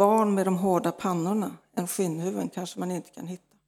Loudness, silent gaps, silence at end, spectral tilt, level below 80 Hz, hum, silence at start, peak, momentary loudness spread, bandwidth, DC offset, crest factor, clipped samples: -28 LUFS; none; 0.3 s; -6 dB/octave; -72 dBFS; none; 0 s; -8 dBFS; 11 LU; 18 kHz; under 0.1%; 20 dB; under 0.1%